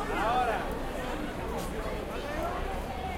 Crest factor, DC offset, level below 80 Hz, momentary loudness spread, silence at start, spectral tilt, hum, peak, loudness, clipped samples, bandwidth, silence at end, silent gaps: 16 dB; under 0.1%; -40 dBFS; 7 LU; 0 s; -5 dB/octave; none; -16 dBFS; -33 LUFS; under 0.1%; 16 kHz; 0 s; none